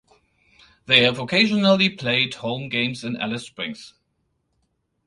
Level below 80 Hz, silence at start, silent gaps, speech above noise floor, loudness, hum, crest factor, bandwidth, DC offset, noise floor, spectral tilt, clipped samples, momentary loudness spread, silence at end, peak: -62 dBFS; 0.9 s; none; 50 dB; -20 LUFS; none; 24 dB; 11.5 kHz; under 0.1%; -72 dBFS; -5 dB/octave; under 0.1%; 15 LU; 1.2 s; 0 dBFS